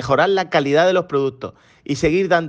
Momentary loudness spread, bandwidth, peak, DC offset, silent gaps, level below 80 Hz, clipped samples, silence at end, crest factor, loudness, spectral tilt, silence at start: 19 LU; 9.2 kHz; -4 dBFS; under 0.1%; none; -46 dBFS; under 0.1%; 0 s; 14 dB; -18 LUFS; -5.5 dB/octave; 0 s